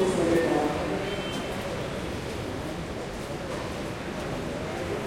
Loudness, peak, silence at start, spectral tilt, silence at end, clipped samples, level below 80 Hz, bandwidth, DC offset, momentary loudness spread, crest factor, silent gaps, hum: -30 LUFS; -10 dBFS; 0 s; -5.5 dB/octave; 0 s; under 0.1%; -46 dBFS; 16.5 kHz; under 0.1%; 10 LU; 18 dB; none; none